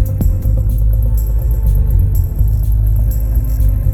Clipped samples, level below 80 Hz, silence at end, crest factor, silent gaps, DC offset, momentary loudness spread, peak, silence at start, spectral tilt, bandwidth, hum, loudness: under 0.1%; -14 dBFS; 0 s; 10 dB; none; under 0.1%; 2 LU; -2 dBFS; 0 s; -9 dB/octave; 15 kHz; none; -16 LUFS